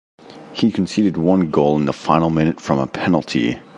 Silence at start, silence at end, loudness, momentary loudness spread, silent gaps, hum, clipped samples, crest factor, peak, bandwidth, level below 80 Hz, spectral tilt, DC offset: 0.3 s; 0 s; -18 LUFS; 5 LU; none; none; under 0.1%; 18 dB; 0 dBFS; 10.5 kHz; -44 dBFS; -7 dB/octave; under 0.1%